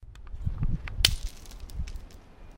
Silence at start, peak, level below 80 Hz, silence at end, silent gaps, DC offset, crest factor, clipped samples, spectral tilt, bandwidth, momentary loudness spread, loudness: 0 s; 0 dBFS; -34 dBFS; 0 s; none; under 0.1%; 32 dB; under 0.1%; -2.5 dB/octave; 16.5 kHz; 22 LU; -30 LUFS